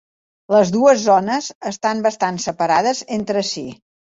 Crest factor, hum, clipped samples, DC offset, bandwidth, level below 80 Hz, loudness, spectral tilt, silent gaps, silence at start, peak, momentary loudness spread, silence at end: 16 dB; none; under 0.1%; under 0.1%; 8 kHz; -60 dBFS; -18 LUFS; -4 dB/octave; 1.55-1.61 s; 0.5 s; -2 dBFS; 10 LU; 0.4 s